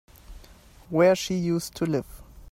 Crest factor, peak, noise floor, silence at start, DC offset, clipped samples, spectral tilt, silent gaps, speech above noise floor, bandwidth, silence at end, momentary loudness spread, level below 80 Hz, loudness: 18 dB; -8 dBFS; -51 dBFS; 0.3 s; under 0.1%; under 0.1%; -5.5 dB/octave; none; 27 dB; 16 kHz; 0.1 s; 10 LU; -50 dBFS; -25 LUFS